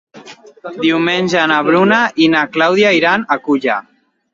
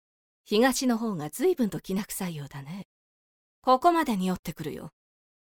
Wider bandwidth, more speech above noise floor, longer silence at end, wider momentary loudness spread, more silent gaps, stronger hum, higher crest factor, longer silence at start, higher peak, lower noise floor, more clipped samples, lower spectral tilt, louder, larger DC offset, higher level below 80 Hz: second, 7.6 kHz vs 19.5 kHz; second, 25 dB vs over 63 dB; about the same, 0.55 s vs 0.65 s; second, 8 LU vs 17 LU; second, none vs 2.85-3.62 s, 4.39-4.43 s; neither; about the same, 14 dB vs 18 dB; second, 0.15 s vs 0.5 s; first, 0 dBFS vs -10 dBFS; second, -38 dBFS vs under -90 dBFS; neither; about the same, -5 dB/octave vs -5 dB/octave; first, -13 LUFS vs -27 LUFS; neither; about the same, -60 dBFS vs -60 dBFS